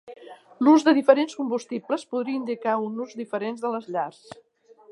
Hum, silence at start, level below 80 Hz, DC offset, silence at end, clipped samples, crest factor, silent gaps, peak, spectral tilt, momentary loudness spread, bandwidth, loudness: none; 0.05 s; -80 dBFS; under 0.1%; 0.8 s; under 0.1%; 22 dB; none; -2 dBFS; -5 dB/octave; 14 LU; 11 kHz; -24 LUFS